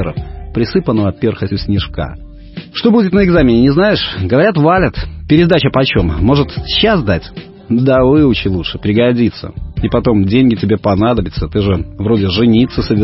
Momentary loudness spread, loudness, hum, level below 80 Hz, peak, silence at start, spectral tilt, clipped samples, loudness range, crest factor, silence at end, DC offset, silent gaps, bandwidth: 12 LU; -12 LUFS; none; -28 dBFS; 0 dBFS; 0 s; -10 dB/octave; under 0.1%; 3 LU; 12 dB; 0 s; under 0.1%; none; 5.8 kHz